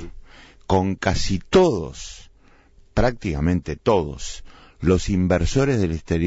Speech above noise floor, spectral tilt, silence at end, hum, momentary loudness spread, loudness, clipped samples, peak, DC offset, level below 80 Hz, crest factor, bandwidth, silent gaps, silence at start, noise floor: 32 dB; -6 dB/octave; 0 s; none; 16 LU; -21 LUFS; under 0.1%; -6 dBFS; under 0.1%; -34 dBFS; 16 dB; 8 kHz; none; 0 s; -52 dBFS